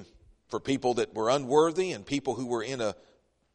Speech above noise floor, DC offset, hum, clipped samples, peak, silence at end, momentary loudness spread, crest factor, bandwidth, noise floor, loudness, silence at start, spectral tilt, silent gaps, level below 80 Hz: 27 dB; under 0.1%; none; under 0.1%; -10 dBFS; 0.6 s; 11 LU; 20 dB; 10.5 kHz; -56 dBFS; -29 LUFS; 0 s; -5 dB/octave; none; -62 dBFS